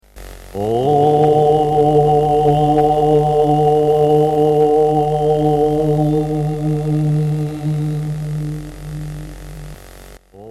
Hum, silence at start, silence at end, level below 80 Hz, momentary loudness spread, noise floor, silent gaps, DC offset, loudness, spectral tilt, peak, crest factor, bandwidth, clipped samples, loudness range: none; 0.15 s; 0 s; -36 dBFS; 16 LU; -39 dBFS; none; under 0.1%; -15 LUFS; -8.5 dB/octave; -2 dBFS; 12 dB; 13 kHz; under 0.1%; 8 LU